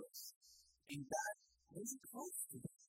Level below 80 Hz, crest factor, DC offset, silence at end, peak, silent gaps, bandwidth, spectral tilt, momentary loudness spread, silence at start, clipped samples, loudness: -84 dBFS; 20 dB; under 0.1%; 0 s; -30 dBFS; 0.36-0.41 s; 16 kHz; -3 dB/octave; 18 LU; 0 s; under 0.1%; -49 LUFS